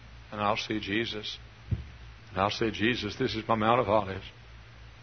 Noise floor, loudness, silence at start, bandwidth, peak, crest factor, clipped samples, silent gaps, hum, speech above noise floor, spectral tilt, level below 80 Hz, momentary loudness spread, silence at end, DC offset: -49 dBFS; -30 LUFS; 0 s; 6.6 kHz; -8 dBFS; 22 dB; under 0.1%; none; none; 20 dB; -5.5 dB/octave; -50 dBFS; 17 LU; 0 s; under 0.1%